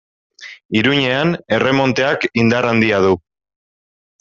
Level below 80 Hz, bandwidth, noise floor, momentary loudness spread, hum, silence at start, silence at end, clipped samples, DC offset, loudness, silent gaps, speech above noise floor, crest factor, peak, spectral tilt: -52 dBFS; 7.6 kHz; under -90 dBFS; 7 LU; none; 0.4 s; 1.05 s; under 0.1%; under 0.1%; -15 LUFS; 0.65-0.69 s; over 75 dB; 16 dB; -2 dBFS; -6 dB/octave